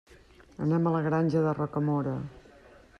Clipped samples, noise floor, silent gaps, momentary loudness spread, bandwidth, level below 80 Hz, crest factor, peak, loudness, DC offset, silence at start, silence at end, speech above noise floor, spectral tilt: under 0.1%; -55 dBFS; none; 8 LU; 6.6 kHz; -60 dBFS; 14 dB; -14 dBFS; -28 LUFS; under 0.1%; 0.6 s; 0.6 s; 28 dB; -9.5 dB/octave